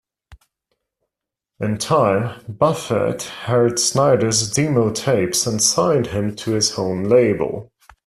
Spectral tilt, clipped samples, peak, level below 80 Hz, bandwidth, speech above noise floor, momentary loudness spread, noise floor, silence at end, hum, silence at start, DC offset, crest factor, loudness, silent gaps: -4 dB/octave; under 0.1%; -2 dBFS; -52 dBFS; 14.5 kHz; 66 dB; 8 LU; -84 dBFS; 0.45 s; none; 0.3 s; under 0.1%; 16 dB; -18 LUFS; none